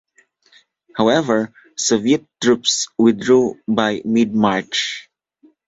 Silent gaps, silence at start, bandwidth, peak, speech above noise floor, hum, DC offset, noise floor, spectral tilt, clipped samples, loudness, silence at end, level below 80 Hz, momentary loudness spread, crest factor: none; 0.95 s; 8 kHz; -2 dBFS; 39 dB; none; under 0.1%; -56 dBFS; -3.5 dB/octave; under 0.1%; -17 LUFS; 0.65 s; -58 dBFS; 6 LU; 16 dB